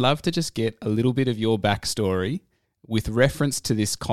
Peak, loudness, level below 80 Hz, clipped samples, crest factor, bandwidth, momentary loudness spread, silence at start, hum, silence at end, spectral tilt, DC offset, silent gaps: -4 dBFS; -24 LUFS; -46 dBFS; under 0.1%; 20 dB; 16 kHz; 6 LU; 0 s; none; 0 s; -5 dB/octave; 0.5%; none